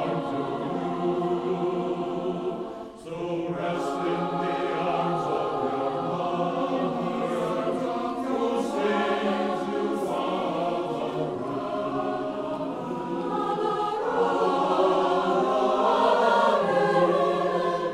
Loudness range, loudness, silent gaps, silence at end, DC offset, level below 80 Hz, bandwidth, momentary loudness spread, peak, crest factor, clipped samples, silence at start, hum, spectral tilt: 7 LU; -26 LUFS; none; 0 s; under 0.1%; -62 dBFS; 12.5 kHz; 8 LU; -10 dBFS; 16 dB; under 0.1%; 0 s; none; -6.5 dB/octave